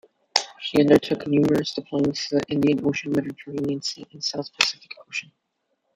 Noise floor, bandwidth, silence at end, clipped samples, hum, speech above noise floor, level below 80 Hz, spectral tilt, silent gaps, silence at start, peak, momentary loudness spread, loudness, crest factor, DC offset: -74 dBFS; 15 kHz; 0.75 s; under 0.1%; none; 52 dB; -60 dBFS; -4.5 dB/octave; none; 0.35 s; 0 dBFS; 13 LU; -23 LUFS; 24 dB; under 0.1%